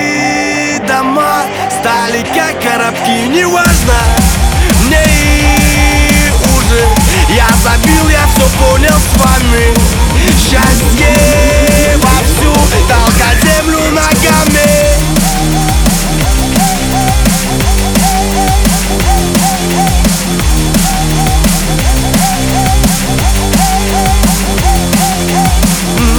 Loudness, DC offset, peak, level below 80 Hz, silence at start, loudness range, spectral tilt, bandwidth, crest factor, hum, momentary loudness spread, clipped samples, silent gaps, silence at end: -9 LUFS; under 0.1%; 0 dBFS; -12 dBFS; 0 s; 2 LU; -4 dB/octave; over 20 kHz; 8 dB; none; 4 LU; 0.3%; none; 0 s